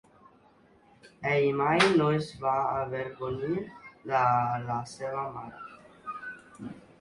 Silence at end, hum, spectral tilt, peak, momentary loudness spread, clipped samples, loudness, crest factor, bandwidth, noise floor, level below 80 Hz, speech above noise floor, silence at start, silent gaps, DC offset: 0.2 s; none; -6 dB/octave; -8 dBFS; 21 LU; under 0.1%; -28 LUFS; 22 dB; 11.5 kHz; -60 dBFS; -62 dBFS; 33 dB; 1.05 s; none; under 0.1%